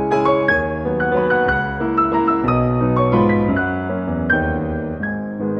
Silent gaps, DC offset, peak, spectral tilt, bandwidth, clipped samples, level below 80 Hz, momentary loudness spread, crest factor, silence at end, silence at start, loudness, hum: none; under 0.1%; -2 dBFS; -9 dB/octave; 6.4 kHz; under 0.1%; -36 dBFS; 8 LU; 16 dB; 0 s; 0 s; -18 LUFS; none